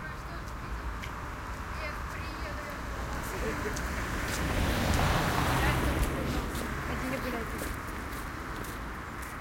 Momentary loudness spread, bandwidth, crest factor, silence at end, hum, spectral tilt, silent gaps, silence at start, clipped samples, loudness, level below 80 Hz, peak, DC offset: 11 LU; 17 kHz; 18 dB; 0 s; none; -5 dB/octave; none; 0 s; under 0.1%; -33 LUFS; -38 dBFS; -14 dBFS; under 0.1%